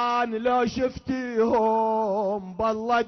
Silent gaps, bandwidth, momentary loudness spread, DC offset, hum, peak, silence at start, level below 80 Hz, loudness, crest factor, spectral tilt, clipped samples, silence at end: none; 6.4 kHz; 6 LU; under 0.1%; none; -12 dBFS; 0 s; -52 dBFS; -25 LUFS; 12 dB; -6 dB/octave; under 0.1%; 0 s